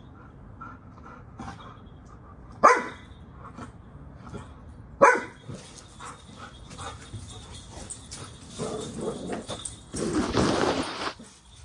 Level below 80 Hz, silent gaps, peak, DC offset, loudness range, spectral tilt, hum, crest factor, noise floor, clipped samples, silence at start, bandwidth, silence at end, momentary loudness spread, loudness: -50 dBFS; none; -2 dBFS; under 0.1%; 13 LU; -4 dB/octave; none; 28 dB; -49 dBFS; under 0.1%; 0.05 s; 11 kHz; 0 s; 27 LU; -26 LUFS